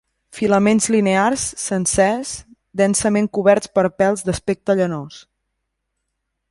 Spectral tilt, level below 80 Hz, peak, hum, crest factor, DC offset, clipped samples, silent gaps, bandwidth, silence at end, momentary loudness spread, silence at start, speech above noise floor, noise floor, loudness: -4.5 dB/octave; -48 dBFS; -2 dBFS; none; 16 dB; under 0.1%; under 0.1%; none; 11.5 kHz; 1.3 s; 10 LU; 0.35 s; 58 dB; -76 dBFS; -18 LUFS